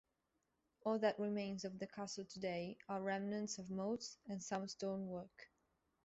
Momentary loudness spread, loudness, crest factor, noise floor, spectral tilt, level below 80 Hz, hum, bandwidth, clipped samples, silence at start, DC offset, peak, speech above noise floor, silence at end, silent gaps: 10 LU; -44 LUFS; 20 dB; -86 dBFS; -5 dB/octave; -80 dBFS; none; 8 kHz; under 0.1%; 0.85 s; under 0.1%; -24 dBFS; 43 dB; 0.6 s; none